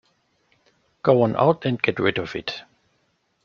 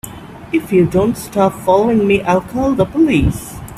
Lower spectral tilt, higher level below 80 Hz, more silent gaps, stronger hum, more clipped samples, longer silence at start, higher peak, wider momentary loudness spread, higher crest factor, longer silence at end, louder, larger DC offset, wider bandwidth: about the same, -7.5 dB/octave vs -7 dB/octave; second, -60 dBFS vs -32 dBFS; neither; neither; neither; first, 1.05 s vs 0.05 s; about the same, -2 dBFS vs 0 dBFS; first, 12 LU vs 8 LU; first, 22 dB vs 14 dB; first, 0.85 s vs 0 s; second, -22 LUFS vs -14 LUFS; neither; second, 7 kHz vs 16 kHz